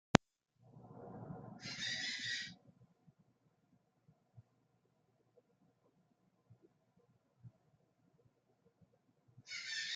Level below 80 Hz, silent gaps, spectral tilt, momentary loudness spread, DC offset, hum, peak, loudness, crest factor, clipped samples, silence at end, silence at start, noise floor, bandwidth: -72 dBFS; none; -4 dB/octave; 25 LU; under 0.1%; none; -6 dBFS; -41 LUFS; 40 dB; under 0.1%; 0 s; 0.15 s; -78 dBFS; 9.8 kHz